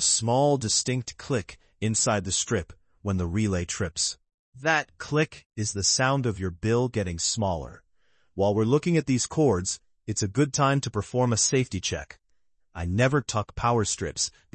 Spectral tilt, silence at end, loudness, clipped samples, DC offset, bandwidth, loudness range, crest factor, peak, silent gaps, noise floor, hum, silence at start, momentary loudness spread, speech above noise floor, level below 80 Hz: -4 dB/octave; 0.25 s; -26 LUFS; under 0.1%; under 0.1%; 9.2 kHz; 3 LU; 18 dB; -8 dBFS; 4.34-4.52 s, 5.46-5.50 s; -71 dBFS; none; 0 s; 10 LU; 45 dB; -52 dBFS